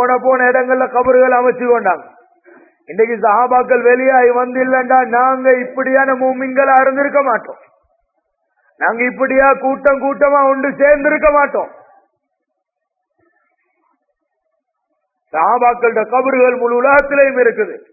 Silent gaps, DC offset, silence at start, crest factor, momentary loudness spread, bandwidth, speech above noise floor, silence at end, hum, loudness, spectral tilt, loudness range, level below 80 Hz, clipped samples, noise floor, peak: none; under 0.1%; 0 s; 14 dB; 6 LU; 2.7 kHz; 63 dB; 0.15 s; none; -12 LUFS; -9.5 dB/octave; 6 LU; -48 dBFS; under 0.1%; -75 dBFS; 0 dBFS